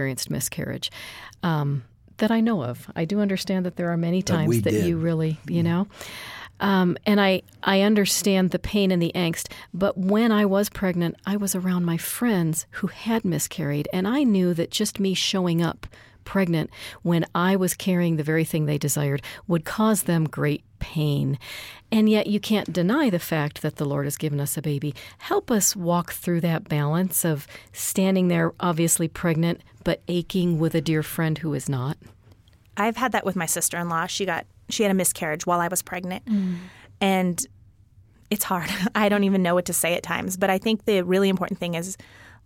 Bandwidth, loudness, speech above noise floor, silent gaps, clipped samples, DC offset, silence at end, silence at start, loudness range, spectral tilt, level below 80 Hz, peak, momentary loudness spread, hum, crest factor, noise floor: 17 kHz; -24 LUFS; 31 dB; none; under 0.1%; under 0.1%; 0.15 s; 0 s; 4 LU; -5 dB/octave; -54 dBFS; -6 dBFS; 9 LU; none; 18 dB; -54 dBFS